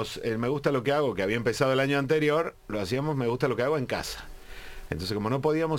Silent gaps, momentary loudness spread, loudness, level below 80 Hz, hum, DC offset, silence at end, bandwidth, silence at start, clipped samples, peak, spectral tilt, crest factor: none; 13 LU; -27 LUFS; -50 dBFS; none; under 0.1%; 0 s; 17 kHz; 0 s; under 0.1%; -12 dBFS; -6 dB/octave; 16 dB